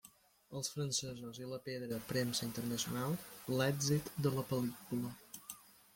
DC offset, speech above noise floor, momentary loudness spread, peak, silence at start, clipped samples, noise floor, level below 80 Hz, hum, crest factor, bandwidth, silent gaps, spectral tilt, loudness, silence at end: under 0.1%; 26 dB; 13 LU; -22 dBFS; 0.05 s; under 0.1%; -65 dBFS; -70 dBFS; none; 18 dB; 17 kHz; none; -4.5 dB/octave; -39 LUFS; 0.25 s